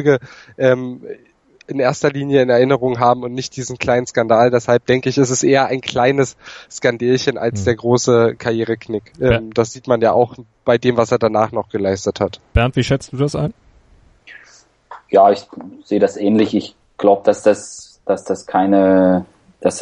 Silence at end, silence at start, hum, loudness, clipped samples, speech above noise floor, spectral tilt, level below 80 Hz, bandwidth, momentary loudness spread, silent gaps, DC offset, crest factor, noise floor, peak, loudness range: 0 s; 0 s; none; -16 LUFS; under 0.1%; 35 dB; -5.5 dB/octave; -40 dBFS; 11 kHz; 10 LU; none; under 0.1%; 16 dB; -50 dBFS; 0 dBFS; 3 LU